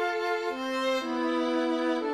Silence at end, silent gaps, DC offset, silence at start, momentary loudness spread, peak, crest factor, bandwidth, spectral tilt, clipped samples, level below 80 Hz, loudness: 0 s; none; under 0.1%; 0 s; 3 LU; -16 dBFS; 12 dB; 13.5 kHz; -2.5 dB/octave; under 0.1%; -70 dBFS; -29 LUFS